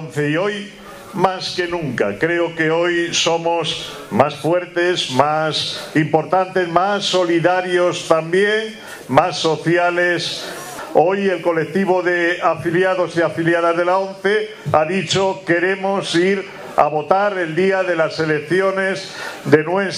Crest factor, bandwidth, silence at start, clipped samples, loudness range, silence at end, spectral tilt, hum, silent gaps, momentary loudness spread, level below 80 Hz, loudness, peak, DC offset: 18 dB; 15 kHz; 0 s; under 0.1%; 1 LU; 0 s; -4.5 dB/octave; none; none; 6 LU; -58 dBFS; -17 LUFS; 0 dBFS; under 0.1%